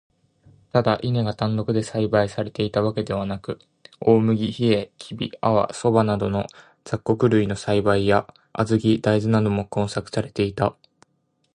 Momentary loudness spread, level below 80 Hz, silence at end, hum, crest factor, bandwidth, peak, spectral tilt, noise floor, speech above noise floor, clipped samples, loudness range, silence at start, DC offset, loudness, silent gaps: 9 LU; -50 dBFS; 0.8 s; none; 20 dB; 11 kHz; -2 dBFS; -7 dB/octave; -69 dBFS; 48 dB; under 0.1%; 2 LU; 0.75 s; under 0.1%; -22 LUFS; none